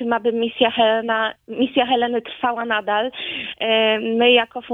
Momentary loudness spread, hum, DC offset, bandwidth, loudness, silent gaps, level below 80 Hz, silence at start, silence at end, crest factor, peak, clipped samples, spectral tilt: 9 LU; none; under 0.1%; 4 kHz; -19 LUFS; none; -62 dBFS; 0 s; 0 s; 18 dB; -2 dBFS; under 0.1%; -6 dB/octave